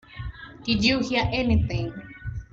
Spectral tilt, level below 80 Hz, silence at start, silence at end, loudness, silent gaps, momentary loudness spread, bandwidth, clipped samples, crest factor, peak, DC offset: -5.5 dB/octave; -38 dBFS; 0.1 s; 0.1 s; -24 LUFS; none; 17 LU; 7.8 kHz; under 0.1%; 18 dB; -8 dBFS; under 0.1%